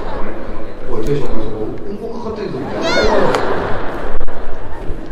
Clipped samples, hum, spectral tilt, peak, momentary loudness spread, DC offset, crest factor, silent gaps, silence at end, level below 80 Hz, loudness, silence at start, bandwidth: under 0.1%; none; -5.5 dB/octave; 0 dBFS; 15 LU; under 0.1%; 10 dB; none; 0 s; -22 dBFS; -20 LUFS; 0 s; 7.4 kHz